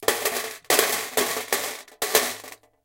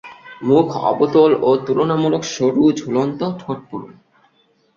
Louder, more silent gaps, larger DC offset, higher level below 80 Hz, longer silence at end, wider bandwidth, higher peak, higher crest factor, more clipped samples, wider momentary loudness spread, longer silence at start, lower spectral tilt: second, -23 LUFS vs -17 LUFS; neither; neither; second, -64 dBFS vs -58 dBFS; second, 0.3 s vs 0.85 s; first, 17 kHz vs 7.6 kHz; about the same, -2 dBFS vs -2 dBFS; first, 24 dB vs 16 dB; neither; second, 11 LU vs 14 LU; about the same, 0 s vs 0.05 s; second, 0 dB/octave vs -6.5 dB/octave